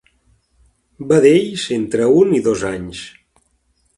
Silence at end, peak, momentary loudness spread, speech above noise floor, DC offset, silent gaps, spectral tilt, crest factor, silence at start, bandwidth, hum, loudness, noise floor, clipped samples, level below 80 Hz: 0.9 s; 0 dBFS; 20 LU; 48 dB; under 0.1%; none; -5.5 dB/octave; 18 dB; 1 s; 11.5 kHz; none; -15 LUFS; -62 dBFS; under 0.1%; -50 dBFS